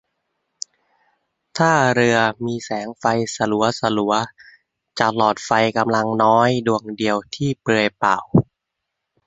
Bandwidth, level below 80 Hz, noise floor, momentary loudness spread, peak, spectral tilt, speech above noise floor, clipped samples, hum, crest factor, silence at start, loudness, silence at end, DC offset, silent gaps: 8.4 kHz; -54 dBFS; -79 dBFS; 14 LU; 0 dBFS; -5 dB/octave; 61 dB; under 0.1%; none; 20 dB; 1.55 s; -19 LUFS; 0.85 s; under 0.1%; none